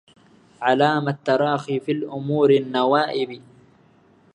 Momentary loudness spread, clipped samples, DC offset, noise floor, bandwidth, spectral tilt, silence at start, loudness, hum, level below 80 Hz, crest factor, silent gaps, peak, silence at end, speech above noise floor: 9 LU; under 0.1%; under 0.1%; -55 dBFS; 8.8 kHz; -7 dB/octave; 0.6 s; -21 LUFS; none; -70 dBFS; 20 dB; none; -2 dBFS; 0.95 s; 35 dB